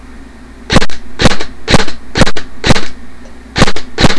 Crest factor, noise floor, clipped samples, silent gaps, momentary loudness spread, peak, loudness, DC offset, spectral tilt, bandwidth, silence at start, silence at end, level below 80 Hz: 8 dB; -31 dBFS; under 0.1%; none; 7 LU; 0 dBFS; -13 LUFS; 7%; -4.5 dB/octave; 11 kHz; 0 s; 0 s; -20 dBFS